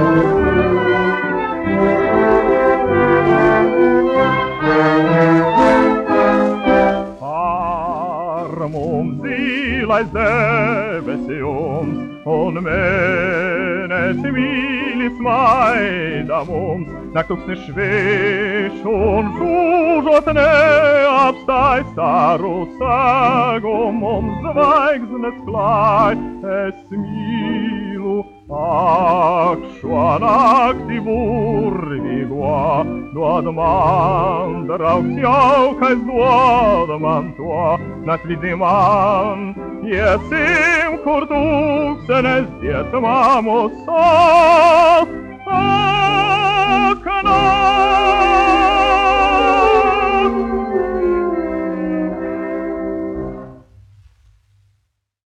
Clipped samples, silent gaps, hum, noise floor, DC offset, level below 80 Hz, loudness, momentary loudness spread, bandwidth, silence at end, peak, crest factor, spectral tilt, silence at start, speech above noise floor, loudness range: under 0.1%; none; none; -67 dBFS; under 0.1%; -38 dBFS; -15 LUFS; 10 LU; 10 kHz; 1.65 s; -2 dBFS; 14 dB; -6.5 dB/octave; 0 s; 52 dB; 6 LU